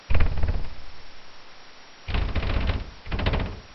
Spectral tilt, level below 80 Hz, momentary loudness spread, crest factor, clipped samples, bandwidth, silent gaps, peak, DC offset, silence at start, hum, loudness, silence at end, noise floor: -7 dB/octave; -28 dBFS; 20 LU; 18 dB; under 0.1%; 6 kHz; none; -6 dBFS; under 0.1%; 0 s; none; -29 LUFS; 0 s; -44 dBFS